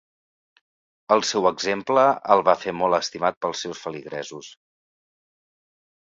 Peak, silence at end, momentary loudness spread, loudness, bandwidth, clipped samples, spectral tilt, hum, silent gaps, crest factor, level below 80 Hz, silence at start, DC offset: 0 dBFS; 1.6 s; 15 LU; -22 LUFS; 7.8 kHz; under 0.1%; -3.5 dB/octave; none; 3.37-3.41 s; 24 dB; -66 dBFS; 1.1 s; under 0.1%